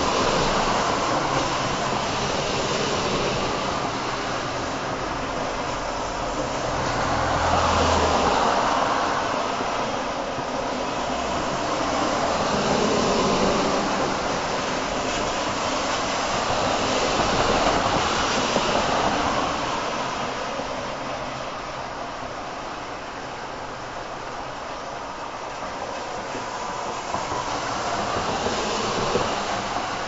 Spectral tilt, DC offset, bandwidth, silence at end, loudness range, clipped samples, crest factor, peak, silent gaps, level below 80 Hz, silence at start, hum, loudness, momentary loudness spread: -3.5 dB/octave; under 0.1%; 8 kHz; 0 s; 10 LU; under 0.1%; 18 dB; -6 dBFS; none; -42 dBFS; 0 s; none; -24 LUFS; 11 LU